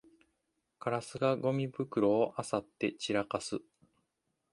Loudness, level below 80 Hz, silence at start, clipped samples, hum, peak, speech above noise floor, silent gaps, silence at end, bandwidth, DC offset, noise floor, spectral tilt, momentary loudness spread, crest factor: -34 LUFS; -72 dBFS; 0.85 s; under 0.1%; none; -16 dBFS; 49 dB; none; 0.9 s; 11.5 kHz; under 0.1%; -82 dBFS; -5.5 dB/octave; 8 LU; 20 dB